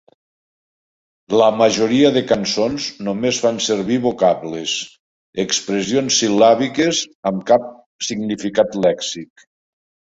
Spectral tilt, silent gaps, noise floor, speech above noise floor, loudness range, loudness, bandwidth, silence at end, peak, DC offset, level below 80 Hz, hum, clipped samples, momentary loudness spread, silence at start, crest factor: -3.5 dB/octave; 4.99-5.33 s, 7.15-7.23 s, 7.86-7.99 s; under -90 dBFS; over 73 dB; 3 LU; -17 LUFS; 8 kHz; 0.85 s; -2 dBFS; under 0.1%; -56 dBFS; none; under 0.1%; 11 LU; 1.3 s; 16 dB